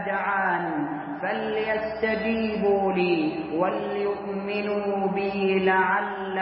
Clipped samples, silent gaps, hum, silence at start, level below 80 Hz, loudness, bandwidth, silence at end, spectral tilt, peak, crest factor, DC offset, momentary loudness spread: under 0.1%; none; none; 0 s; -58 dBFS; -25 LUFS; 5.6 kHz; 0 s; -10.5 dB/octave; -8 dBFS; 16 dB; under 0.1%; 7 LU